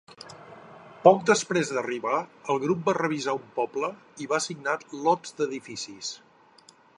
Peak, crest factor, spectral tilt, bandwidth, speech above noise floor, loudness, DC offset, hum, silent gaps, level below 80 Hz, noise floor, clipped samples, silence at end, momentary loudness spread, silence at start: -2 dBFS; 24 dB; -4 dB/octave; 11 kHz; 30 dB; -26 LUFS; under 0.1%; none; none; -76 dBFS; -56 dBFS; under 0.1%; 0.8 s; 23 LU; 0.1 s